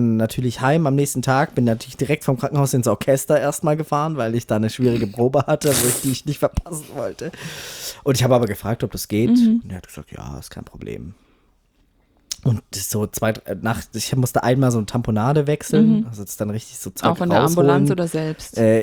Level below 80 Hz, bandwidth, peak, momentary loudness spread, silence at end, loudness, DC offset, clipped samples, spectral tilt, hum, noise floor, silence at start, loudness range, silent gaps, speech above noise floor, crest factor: -44 dBFS; over 20 kHz; -2 dBFS; 15 LU; 0 s; -20 LUFS; under 0.1%; under 0.1%; -5.5 dB/octave; none; -60 dBFS; 0 s; 7 LU; none; 41 dB; 16 dB